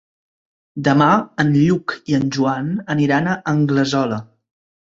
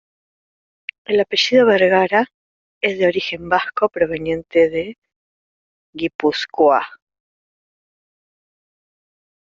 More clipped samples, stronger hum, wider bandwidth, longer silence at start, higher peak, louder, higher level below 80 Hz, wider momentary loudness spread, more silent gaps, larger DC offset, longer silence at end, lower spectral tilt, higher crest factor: neither; neither; about the same, 7.8 kHz vs 7.4 kHz; second, 0.75 s vs 1.1 s; about the same, -2 dBFS vs -2 dBFS; about the same, -18 LUFS vs -17 LUFS; about the same, -54 dBFS vs -58 dBFS; second, 8 LU vs 17 LU; second, none vs 2.34-2.81 s, 4.98-5.02 s, 5.16-5.93 s, 6.15-6.19 s; neither; second, 0.7 s vs 2.65 s; first, -6.5 dB/octave vs -2 dB/octave; about the same, 16 dB vs 18 dB